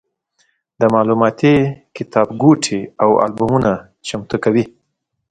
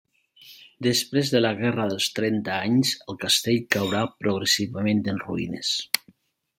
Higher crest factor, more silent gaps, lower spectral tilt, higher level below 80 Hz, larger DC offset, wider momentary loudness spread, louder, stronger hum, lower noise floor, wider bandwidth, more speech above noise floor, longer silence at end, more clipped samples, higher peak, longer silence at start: second, 16 dB vs 26 dB; neither; first, -6 dB/octave vs -4 dB/octave; first, -48 dBFS vs -64 dBFS; neither; first, 11 LU vs 6 LU; first, -16 LUFS vs -24 LUFS; neither; first, -72 dBFS vs -59 dBFS; second, 9.4 kHz vs 16.5 kHz; first, 57 dB vs 35 dB; about the same, 0.65 s vs 0.6 s; neither; about the same, 0 dBFS vs 0 dBFS; first, 0.8 s vs 0.45 s